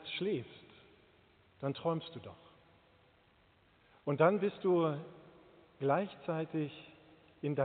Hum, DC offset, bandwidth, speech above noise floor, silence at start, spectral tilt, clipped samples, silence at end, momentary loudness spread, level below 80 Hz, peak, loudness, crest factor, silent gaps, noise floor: none; under 0.1%; 4.6 kHz; 34 dB; 0 s; -5.5 dB/octave; under 0.1%; 0 s; 23 LU; -78 dBFS; -14 dBFS; -35 LUFS; 24 dB; none; -68 dBFS